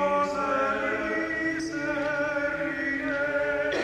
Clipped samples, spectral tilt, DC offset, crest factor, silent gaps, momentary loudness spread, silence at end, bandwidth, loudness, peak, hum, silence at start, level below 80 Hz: under 0.1%; -5 dB/octave; under 0.1%; 14 dB; none; 3 LU; 0 s; 11.5 kHz; -27 LUFS; -14 dBFS; none; 0 s; -54 dBFS